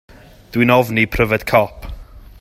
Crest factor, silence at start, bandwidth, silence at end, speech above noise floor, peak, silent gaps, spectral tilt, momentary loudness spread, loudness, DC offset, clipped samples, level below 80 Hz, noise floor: 18 dB; 0.55 s; 16 kHz; 0.2 s; 19 dB; 0 dBFS; none; -6.5 dB/octave; 16 LU; -16 LUFS; under 0.1%; under 0.1%; -34 dBFS; -34 dBFS